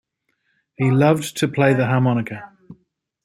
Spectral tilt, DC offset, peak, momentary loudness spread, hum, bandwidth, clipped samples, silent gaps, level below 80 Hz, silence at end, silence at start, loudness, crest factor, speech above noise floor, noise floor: -6.5 dB/octave; under 0.1%; -2 dBFS; 9 LU; none; 15 kHz; under 0.1%; none; -60 dBFS; 0.5 s; 0.8 s; -18 LUFS; 18 dB; 53 dB; -70 dBFS